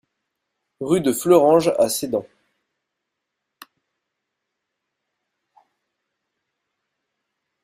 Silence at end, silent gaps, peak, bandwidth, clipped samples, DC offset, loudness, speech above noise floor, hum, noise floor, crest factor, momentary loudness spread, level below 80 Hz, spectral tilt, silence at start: 5.4 s; none; -2 dBFS; 16 kHz; under 0.1%; under 0.1%; -18 LUFS; 63 dB; none; -80 dBFS; 22 dB; 13 LU; -64 dBFS; -5 dB/octave; 0.8 s